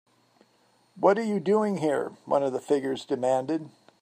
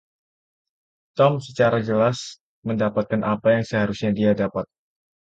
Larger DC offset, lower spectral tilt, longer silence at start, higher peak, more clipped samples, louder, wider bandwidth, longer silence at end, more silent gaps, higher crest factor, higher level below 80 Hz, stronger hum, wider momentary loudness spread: neither; about the same, -6.5 dB/octave vs -6.5 dB/octave; second, 0.95 s vs 1.15 s; about the same, -6 dBFS vs -4 dBFS; neither; second, -26 LUFS vs -22 LUFS; first, 10.5 kHz vs 8.6 kHz; second, 0.35 s vs 0.6 s; second, none vs 2.40-2.62 s; about the same, 20 dB vs 18 dB; second, -76 dBFS vs -56 dBFS; neither; second, 7 LU vs 12 LU